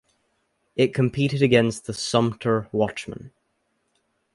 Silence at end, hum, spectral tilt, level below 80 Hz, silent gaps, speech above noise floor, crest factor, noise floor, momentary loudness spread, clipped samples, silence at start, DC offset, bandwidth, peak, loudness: 1.05 s; none; -6 dB/octave; -56 dBFS; none; 50 dB; 20 dB; -72 dBFS; 15 LU; under 0.1%; 0.75 s; under 0.1%; 11.5 kHz; -4 dBFS; -22 LUFS